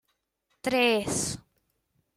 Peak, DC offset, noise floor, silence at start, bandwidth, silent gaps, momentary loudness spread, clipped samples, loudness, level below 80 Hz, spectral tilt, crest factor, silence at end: -12 dBFS; under 0.1%; -77 dBFS; 0.65 s; 16 kHz; none; 12 LU; under 0.1%; -27 LUFS; -58 dBFS; -3 dB/octave; 20 dB; 0.75 s